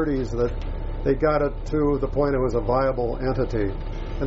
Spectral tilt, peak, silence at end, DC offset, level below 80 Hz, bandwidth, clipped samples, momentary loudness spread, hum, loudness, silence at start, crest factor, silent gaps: -7.5 dB/octave; -8 dBFS; 0 s; under 0.1%; -30 dBFS; 7.6 kHz; under 0.1%; 8 LU; none; -24 LUFS; 0 s; 16 dB; none